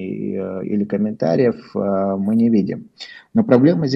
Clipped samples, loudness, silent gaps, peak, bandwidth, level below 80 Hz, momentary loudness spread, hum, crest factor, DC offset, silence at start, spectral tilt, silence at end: under 0.1%; -18 LUFS; none; 0 dBFS; 7.2 kHz; -60 dBFS; 12 LU; none; 18 dB; under 0.1%; 0 s; -9 dB/octave; 0 s